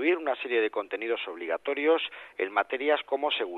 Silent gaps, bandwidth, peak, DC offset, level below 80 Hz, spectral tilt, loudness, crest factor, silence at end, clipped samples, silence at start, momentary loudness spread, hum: none; 4.3 kHz; -10 dBFS; under 0.1%; -80 dBFS; -4 dB/octave; -29 LUFS; 18 dB; 0 s; under 0.1%; 0 s; 7 LU; none